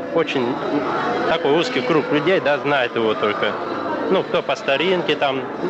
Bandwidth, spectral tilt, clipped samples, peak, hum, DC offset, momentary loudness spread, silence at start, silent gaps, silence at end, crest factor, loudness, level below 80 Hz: 8.4 kHz; -5.5 dB/octave; under 0.1%; -8 dBFS; none; under 0.1%; 4 LU; 0 s; none; 0 s; 12 dB; -19 LUFS; -60 dBFS